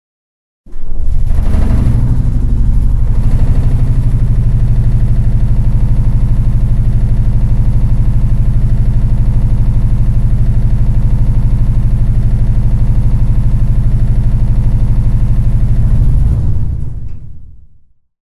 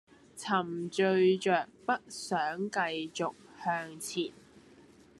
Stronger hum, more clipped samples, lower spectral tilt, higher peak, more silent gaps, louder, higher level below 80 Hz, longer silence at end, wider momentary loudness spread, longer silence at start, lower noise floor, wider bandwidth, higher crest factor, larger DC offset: neither; neither; first, -9.5 dB/octave vs -4.5 dB/octave; first, 0 dBFS vs -14 dBFS; neither; first, -14 LUFS vs -32 LUFS; first, -12 dBFS vs -78 dBFS; about the same, 0.7 s vs 0.6 s; second, 2 LU vs 11 LU; first, 0.7 s vs 0.35 s; second, -42 dBFS vs -58 dBFS; second, 3 kHz vs 12.5 kHz; second, 8 dB vs 20 dB; neither